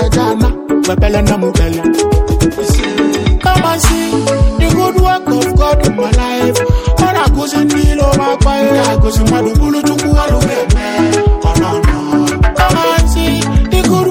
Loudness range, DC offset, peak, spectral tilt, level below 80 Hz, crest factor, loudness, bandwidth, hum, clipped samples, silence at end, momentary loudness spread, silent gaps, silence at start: 1 LU; under 0.1%; 0 dBFS; -5.5 dB/octave; -16 dBFS; 10 dB; -12 LUFS; 17 kHz; none; under 0.1%; 0 s; 2 LU; none; 0 s